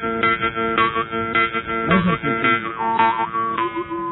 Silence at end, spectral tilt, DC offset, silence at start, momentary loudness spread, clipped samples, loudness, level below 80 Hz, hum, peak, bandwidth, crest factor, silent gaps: 0 s; -9.5 dB/octave; under 0.1%; 0 s; 5 LU; under 0.1%; -19 LUFS; -48 dBFS; none; -2 dBFS; 4.1 kHz; 18 dB; none